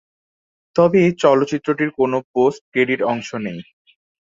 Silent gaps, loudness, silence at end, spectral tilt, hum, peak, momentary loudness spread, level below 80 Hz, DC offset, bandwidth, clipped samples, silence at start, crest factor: 2.24-2.34 s, 2.61-2.72 s; -18 LUFS; 0.6 s; -6.5 dB/octave; none; -2 dBFS; 12 LU; -60 dBFS; under 0.1%; 7.6 kHz; under 0.1%; 0.75 s; 16 dB